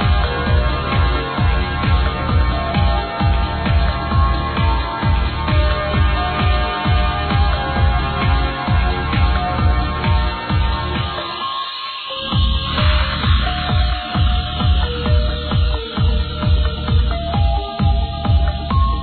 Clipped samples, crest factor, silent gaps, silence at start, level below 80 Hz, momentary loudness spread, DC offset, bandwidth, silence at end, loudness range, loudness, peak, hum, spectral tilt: under 0.1%; 12 dB; none; 0 s; -20 dBFS; 3 LU; under 0.1%; 4.6 kHz; 0 s; 2 LU; -18 LUFS; -4 dBFS; none; -9 dB/octave